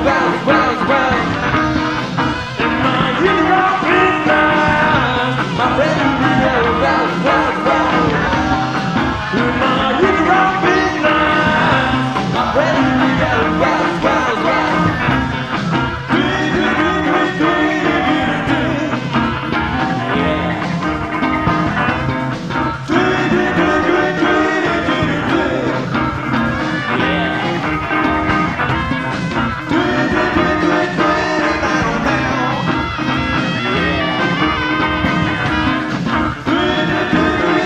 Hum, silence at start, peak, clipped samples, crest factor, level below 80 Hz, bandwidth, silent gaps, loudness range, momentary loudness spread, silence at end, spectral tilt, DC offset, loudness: none; 0 s; 0 dBFS; under 0.1%; 14 dB; -34 dBFS; 9.6 kHz; none; 3 LU; 5 LU; 0 s; -6 dB/octave; 0.3%; -15 LUFS